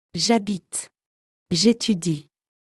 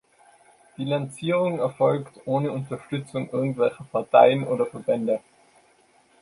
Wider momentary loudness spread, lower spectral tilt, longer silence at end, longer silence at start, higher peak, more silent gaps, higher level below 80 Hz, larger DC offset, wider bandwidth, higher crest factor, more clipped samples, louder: about the same, 12 LU vs 13 LU; second, -4 dB/octave vs -7 dB/octave; second, 0.55 s vs 1.05 s; second, 0.15 s vs 0.8 s; about the same, -4 dBFS vs -2 dBFS; first, 1.06-1.46 s vs none; first, -60 dBFS vs -68 dBFS; neither; about the same, 12 kHz vs 11.5 kHz; about the same, 20 dB vs 22 dB; neither; about the same, -22 LUFS vs -24 LUFS